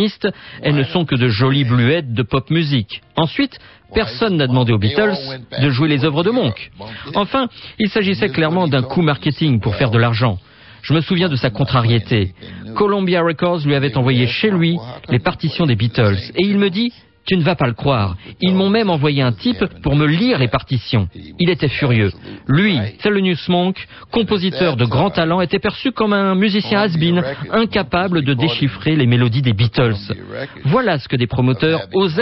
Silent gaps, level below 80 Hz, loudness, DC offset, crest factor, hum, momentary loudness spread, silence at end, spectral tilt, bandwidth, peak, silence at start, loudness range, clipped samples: none; -40 dBFS; -17 LUFS; under 0.1%; 14 dB; none; 7 LU; 0 s; -9.5 dB/octave; 5.8 kHz; -2 dBFS; 0 s; 1 LU; under 0.1%